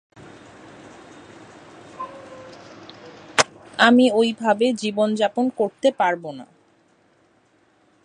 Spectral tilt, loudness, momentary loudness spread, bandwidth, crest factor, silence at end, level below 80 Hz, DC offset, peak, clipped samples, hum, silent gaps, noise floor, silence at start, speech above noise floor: -3.5 dB/octave; -20 LUFS; 26 LU; 11.5 kHz; 24 dB; 1.6 s; -68 dBFS; under 0.1%; 0 dBFS; under 0.1%; none; none; -60 dBFS; 2 s; 41 dB